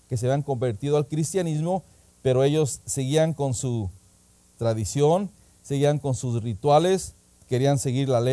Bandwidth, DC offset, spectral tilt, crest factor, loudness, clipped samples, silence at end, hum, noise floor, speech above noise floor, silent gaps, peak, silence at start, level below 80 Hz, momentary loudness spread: 11 kHz; under 0.1%; -6 dB/octave; 16 dB; -24 LUFS; under 0.1%; 0 s; none; -58 dBFS; 34 dB; none; -8 dBFS; 0.1 s; -54 dBFS; 8 LU